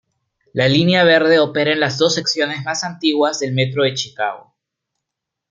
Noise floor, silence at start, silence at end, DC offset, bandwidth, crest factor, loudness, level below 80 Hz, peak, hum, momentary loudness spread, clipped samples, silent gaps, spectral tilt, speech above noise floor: -81 dBFS; 0.55 s; 1.1 s; under 0.1%; 8.8 kHz; 18 dB; -16 LUFS; -60 dBFS; 0 dBFS; none; 11 LU; under 0.1%; none; -4.5 dB/octave; 65 dB